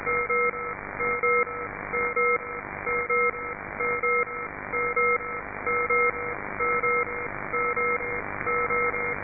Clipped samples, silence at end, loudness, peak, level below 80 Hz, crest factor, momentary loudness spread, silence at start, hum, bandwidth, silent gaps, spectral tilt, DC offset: under 0.1%; 0 s; -26 LUFS; -14 dBFS; -52 dBFS; 14 dB; 9 LU; 0 s; none; 2.6 kHz; none; -11.5 dB/octave; under 0.1%